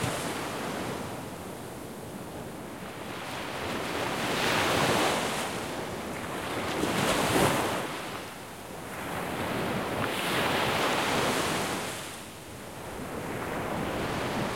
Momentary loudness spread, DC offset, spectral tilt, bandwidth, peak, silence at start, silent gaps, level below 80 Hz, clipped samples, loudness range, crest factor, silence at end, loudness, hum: 15 LU; 0.1%; -3.5 dB/octave; 16.5 kHz; -10 dBFS; 0 s; none; -54 dBFS; under 0.1%; 8 LU; 20 dB; 0 s; -30 LUFS; none